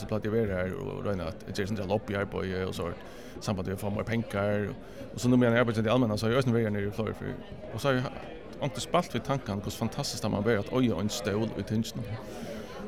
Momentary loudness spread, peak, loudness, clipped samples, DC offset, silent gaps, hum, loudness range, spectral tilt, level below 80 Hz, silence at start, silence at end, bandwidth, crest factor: 12 LU; -12 dBFS; -30 LUFS; under 0.1%; 0.3%; none; none; 5 LU; -6 dB/octave; -52 dBFS; 0 s; 0 s; 16.5 kHz; 18 dB